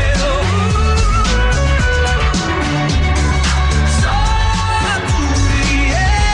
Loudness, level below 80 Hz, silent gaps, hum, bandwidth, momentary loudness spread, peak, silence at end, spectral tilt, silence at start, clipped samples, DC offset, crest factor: -15 LUFS; -16 dBFS; none; none; 11 kHz; 2 LU; -2 dBFS; 0 s; -4.5 dB/octave; 0 s; under 0.1%; under 0.1%; 10 dB